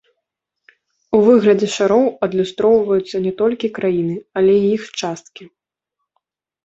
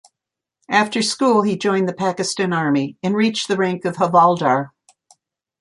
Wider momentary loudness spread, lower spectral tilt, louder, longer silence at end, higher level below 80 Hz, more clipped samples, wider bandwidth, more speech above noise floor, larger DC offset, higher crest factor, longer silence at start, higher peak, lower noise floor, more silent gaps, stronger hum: first, 10 LU vs 7 LU; first, -6 dB/octave vs -4.5 dB/octave; about the same, -16 LUFS vs -18 LUFS; first, 1.2 s vs 0.95 s; first, -58 dBFS vs -66 dBFS; neither; second, 8 kHz vs 11.5 kHz; second, 63 dB vs 67 dB; neither; about the same, 16 dB vs 18 dB; first, 1.1 s vs 0.7 s; about the same, -2 dBFS vs -2 dBFS; second, -78 dBFS vs -85 dBFS; neither; neither